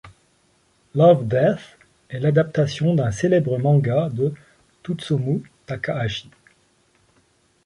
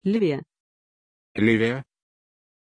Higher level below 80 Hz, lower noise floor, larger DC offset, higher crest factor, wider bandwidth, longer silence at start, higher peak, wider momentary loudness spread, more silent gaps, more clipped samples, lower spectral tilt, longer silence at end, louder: first, -54 dBFS vs -60 dBFS; second, -62 dBFS vs under -90 dBFS; neither; about the same, 20 dB vs 20 dB; about the same, 10.5 kHz vs 10 kHz; about the same, 0.05 s vs 0.05 s; first, -2 dBFS vs -8 dBFS; about the same, 14 LU vs 13 LU; second, none vs 0.60-1.35 s; neither; about the same, -7.5 dB/octave vs -7.5 dB/octave; first, 1.45 s vs 0.9 s; about the same, -21 LUFS vs -23 LUFS